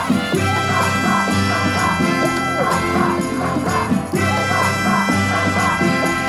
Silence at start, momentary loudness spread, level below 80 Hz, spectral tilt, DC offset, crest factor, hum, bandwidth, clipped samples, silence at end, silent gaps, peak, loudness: 0 s; 3 LU; -46 dBFS; -5 dB/octave; under 0.1%; 14 dB; none; 16 kHz; under 0.1%; 0 s; none; -4 dBFS; -17 LUFS